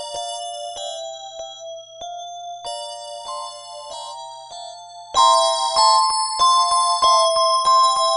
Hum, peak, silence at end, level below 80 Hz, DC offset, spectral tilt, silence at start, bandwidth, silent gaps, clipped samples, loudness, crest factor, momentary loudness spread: 60 Hz at -65 dBFS; -2 dBFS; 0 s; -58 dBFS; under 0.1%; 1.5 dB/octave; 0 s; 10.5 kHz; none; under 0.1%; -17 LUFS; 18 dB; 20 LU